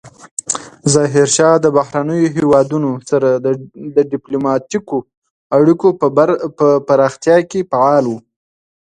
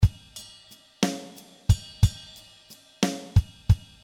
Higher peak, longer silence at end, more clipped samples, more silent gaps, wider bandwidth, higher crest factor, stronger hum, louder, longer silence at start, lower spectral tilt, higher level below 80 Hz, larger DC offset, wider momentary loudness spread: first, 0 dBFS vs -6 dBFS; first, 0.8 s vs 0.25 s; neither; first, 0.31-0.37 s, 5.17-5.22 s, 5.30-5.50 s vs none; second, 11 kHz vs 15.5 kHz; second, 14 dB vs 22 dB; neither; first, -14 LUFS vs -26 LUFS; about the same, 0.05 s vs 0 s; about the same, -5.5 dB/octave vs -5.5 dB/octave; second, -56 dBFS vs -34 dBFS; neither; second, 10 LU vs 20 LU